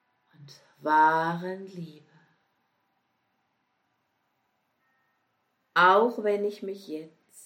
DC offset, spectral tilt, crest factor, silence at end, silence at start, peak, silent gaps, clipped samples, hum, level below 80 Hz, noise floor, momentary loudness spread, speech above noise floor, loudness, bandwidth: under 0.1%; -5.5 dB/octave; 22 dB; 0.4 s; 0.85 s; -8 dBFS; none; under 0.1%; none; -86 dBFS; -75 dBFS; 20 LU; 49 dB; -24 LUFS; 16 kHz